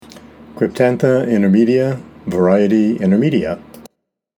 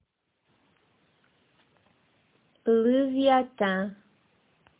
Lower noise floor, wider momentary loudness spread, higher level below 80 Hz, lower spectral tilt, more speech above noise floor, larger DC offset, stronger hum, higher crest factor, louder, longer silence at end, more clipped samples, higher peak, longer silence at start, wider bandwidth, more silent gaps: second, -57 dBFS vs -75 dBFS; about the same, 10 LU vs 10 LU; first, -52 dBFS vs -72 dBFS; second, -8 dB/octave vs -9.5 dB/octave; second, 43 dB vs 51 dB; neither; neither; about the same, 16 dB vs 20 dB; first, -15 LUFS vs -25 LUFS; second, 0.6 s vs 0.85 s; neither; first, 0 dBFS vs -10 dBFS; second, 0.15 s vs 2.65 s; first, 12.5 kHz vs 4 kHz; neither